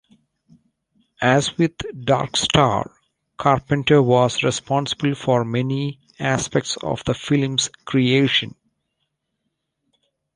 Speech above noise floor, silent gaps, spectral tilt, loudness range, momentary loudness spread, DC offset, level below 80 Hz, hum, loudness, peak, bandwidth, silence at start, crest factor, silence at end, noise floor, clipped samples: 57 dB; none; -5 dB/octave; 3 LU; 8 LU; under 0.1%; -50 dBFS; none; -20 LUFS; -2 dBFS; 11 kHz; 1.2 s; 20 dB; 1.85 s; -76 dBFS; under 0.1%